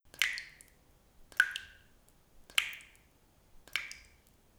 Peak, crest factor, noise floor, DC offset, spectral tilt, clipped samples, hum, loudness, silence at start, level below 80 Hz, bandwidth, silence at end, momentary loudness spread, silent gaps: -8 dBFS; 32 dB; -66 dBFS; under 0.1%; 1.5 dB/octave; under 0.1%; none; -35 LUFS; 0.2 s; -66 dBFS; over 20 kHz; 0.6 s; 20 LU; none